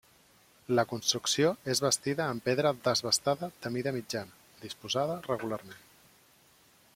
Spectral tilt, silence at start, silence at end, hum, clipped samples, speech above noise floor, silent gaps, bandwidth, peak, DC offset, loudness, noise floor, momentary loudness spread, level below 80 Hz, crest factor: -3.5 dB/octave; 0.7 s; 1.2 s; none; under 0.1%; 32 dB; none; 16.5 kHz; -12 dBFS; under 0.1%; -30 LUFS; -63 dBFS; 13 LU; -70 dBFS; 20 dB